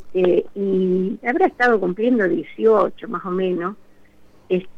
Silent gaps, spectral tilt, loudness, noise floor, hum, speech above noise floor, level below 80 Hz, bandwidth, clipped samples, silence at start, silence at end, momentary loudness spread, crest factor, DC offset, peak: none; -8.5 dB/octave; -20 LUFS; -47 dBFS; none; 28 dB; -58 dBFS; 6.8 kHz; under 0.1%; 0 s; 0 s; 8 LU; 16 dB; under 0.1%; -4 dBFS